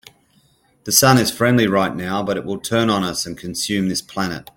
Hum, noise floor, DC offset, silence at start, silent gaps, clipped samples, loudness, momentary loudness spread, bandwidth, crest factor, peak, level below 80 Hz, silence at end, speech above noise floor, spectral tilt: none; -58 dBFS; under 0.1%; 0.85 s; none; under 0.1%; -18 LUFS; 11 LU; 17 kHz; 20 dB; 0 dBFS; -52 dBFS; 0.15 s; 39 dB; -4 dB/octave